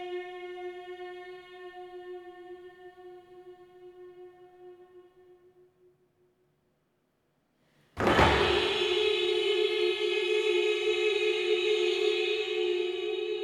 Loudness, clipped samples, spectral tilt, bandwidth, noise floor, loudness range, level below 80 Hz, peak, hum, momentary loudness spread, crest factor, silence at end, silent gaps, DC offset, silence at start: -27 LUFS; under 0.1%; -4.5 dB/octave; 12.5 kHz; -74 dBFS; 22 LU; -50 dBFS; -10 dBFS; none; 22 LU; 20 dB; 0 s; none; under 0.1%; 0 s